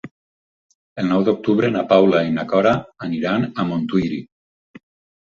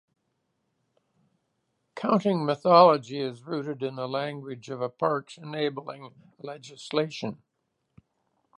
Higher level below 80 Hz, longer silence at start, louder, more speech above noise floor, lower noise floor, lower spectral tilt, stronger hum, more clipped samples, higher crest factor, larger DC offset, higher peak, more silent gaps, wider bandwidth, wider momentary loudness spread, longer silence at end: first, -54 dBFS vs -78 dBFS; second, 0.05 s vs 1.95 s; first, -19 LUFS vs -26 LUFS; first, over 72 dB vs 52 dB; first, under -90 dBFS vs -78 dBFS; first, -8 dB/octave vs -6.5 dB/octave; neither; neither; second, 18 dB vs 24 dB; neither; about the same, -2 dBFS vs -4 dBFS; first, 0.11-0.69 s, 0.75-0.96 s vs none; second, 7.2 kHz vs 10.5 kHz; second, 11 LU vs 22 LU; second, 0.95 s vs 1.25 s